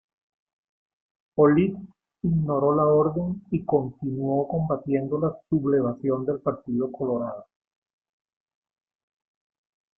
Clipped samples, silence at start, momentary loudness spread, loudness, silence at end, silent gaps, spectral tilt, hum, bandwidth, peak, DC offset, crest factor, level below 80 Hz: under 0.1%; 1.35 s; 10 LU; -25 LUFS; 2.55 s; none; -13 dB/octave; none; 3.3 kHz; -6 dBFS; under 0.1%; 20 dB; -56 dBFS